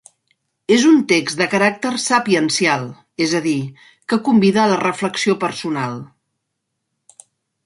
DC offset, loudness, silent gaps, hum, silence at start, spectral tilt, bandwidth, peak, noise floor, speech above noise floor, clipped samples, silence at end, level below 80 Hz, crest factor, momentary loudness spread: under 0.1%; -17 LUFS; none; none; 0.7 s; -4.5 dB/octave; 11.5 kHz; -2 dBFS; -76 dBFS; 59 dB; under 0.1%; 1.6 s; -64 dBFS; 16 dB; 12 LU